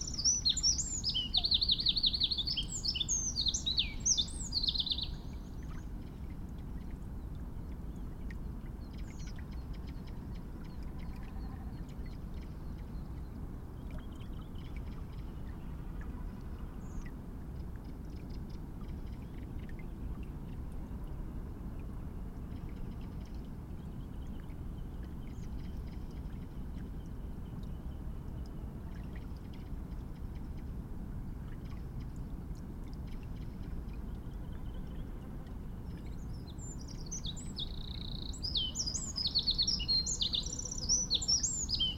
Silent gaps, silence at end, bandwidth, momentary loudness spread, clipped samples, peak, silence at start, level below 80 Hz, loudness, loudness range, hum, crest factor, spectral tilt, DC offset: none; 0 s; 16 kHz; 16 LU; under 0.1%; -18 dBFS; 0 s; -44 dBFS; -37 LUFS; 15 LU; none; 22 dB; -2.5 dB/octave; under 0.1%